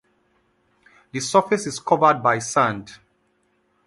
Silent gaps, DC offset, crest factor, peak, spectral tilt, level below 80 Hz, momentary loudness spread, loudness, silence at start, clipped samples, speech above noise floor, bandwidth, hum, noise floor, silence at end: none; under 0.1%; 22 dB; -2 dBFS; -4 dB/octave; -64 dBFS; 12 LU; -20 LUFS; 1.15 s; under 0.1%; 46 dB; 11.5 kHz; none; -66 dBFS; 0.9 s